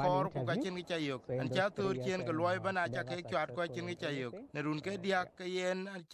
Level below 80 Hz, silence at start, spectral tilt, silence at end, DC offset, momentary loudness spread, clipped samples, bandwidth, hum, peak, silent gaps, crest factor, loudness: -72 dBFS; 0 s; -6 dB/octave; 0 s; under 0.1%; 6 LU; under 0.1%; 12.5 kHz; none; -20 dBFS; none; 16 dB; -36 LUFS